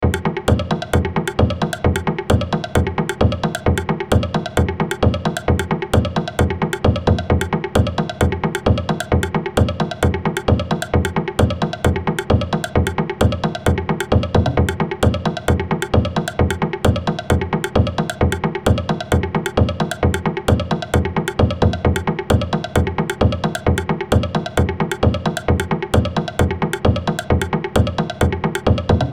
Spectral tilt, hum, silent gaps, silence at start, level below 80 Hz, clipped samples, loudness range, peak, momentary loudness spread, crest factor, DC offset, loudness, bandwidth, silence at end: -6.5 dB/octave; none; none; 0 s; -28 dBFS; under 0.1%; 1 LU; -2 dBFS; 2 LU; 16 dB; under 0.1%; -19 LUFS; 14.5 kHz; 0 s